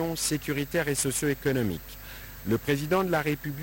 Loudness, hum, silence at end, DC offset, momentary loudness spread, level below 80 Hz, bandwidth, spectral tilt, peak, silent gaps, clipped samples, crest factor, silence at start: -28 LUFS; none; 0 s; under 0.1%; 12 LU; -48 dBFS; over 20 kHz; -4.5 dB/octave; -14 dBFS; none; under 0.1%; 14 dB; 0 s